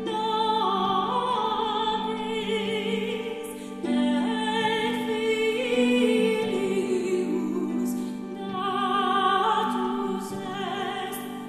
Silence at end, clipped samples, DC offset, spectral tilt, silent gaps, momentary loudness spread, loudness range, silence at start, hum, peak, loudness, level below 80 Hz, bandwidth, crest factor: 0 s; under 0.1%; under 0.1%; -4.5 dB/octave; none; 9 LU; 3 LU; 0 s; none; -10 dBFS; -26 LUFS; -62 dBFS; 14 kHz; 16 dB